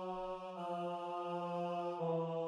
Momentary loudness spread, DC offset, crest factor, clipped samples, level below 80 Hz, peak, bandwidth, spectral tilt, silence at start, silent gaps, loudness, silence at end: 5 LU; under 0.1%; 12 dB; under 0.1%; -72 dBFS; -28 dBFS; 10 kHz; -7.5 dB/octave; 0 s; none; -41 LUFS; 0 s